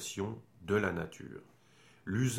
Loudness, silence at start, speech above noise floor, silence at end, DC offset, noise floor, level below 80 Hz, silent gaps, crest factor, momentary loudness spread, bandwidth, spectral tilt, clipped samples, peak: -36 LUFS; 0 s; 29 dB; 0 s; under 0.1%; -63 dBFS; -64 dBFS; none; 20 dB; 17 LU; 16 kHz; -5.5 dB/octave; under 0.1%; -16 dBFS